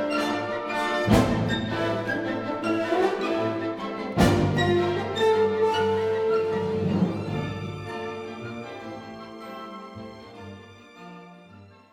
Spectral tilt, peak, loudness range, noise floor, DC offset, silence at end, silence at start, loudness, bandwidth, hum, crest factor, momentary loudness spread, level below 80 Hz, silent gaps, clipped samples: -6.5 dB/octave; -6 dBFS; 15 LU; -49 dBFS; under 0.1%; 0.25 s; 0 s; -25 LUFS; 17.5 kHz; none; 20 dB; 20 LU; -46 dBFS; none; under 0.1%